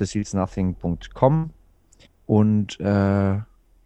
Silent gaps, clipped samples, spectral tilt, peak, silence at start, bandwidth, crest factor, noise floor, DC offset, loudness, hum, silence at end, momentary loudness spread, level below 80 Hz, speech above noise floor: none; under 0.1%; -7.5 dB/octave; -2 dBFS; 0 s; 8.8 kHz; 20 dB; -55 dBFS; under 0.1%; -22 LUFS; none; 0.4 s; 10 LU; -46 dBFS; 34 dB